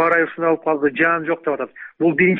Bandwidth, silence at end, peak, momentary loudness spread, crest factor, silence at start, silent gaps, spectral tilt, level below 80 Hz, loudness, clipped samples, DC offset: 4.4 kHz; 0 s; -4 dBFS; 8 LU; 14 dB; 0 s; none; -5.5 dB/octave; -62 dBFS; -19 LUFS; under 0.1%; under 0.1%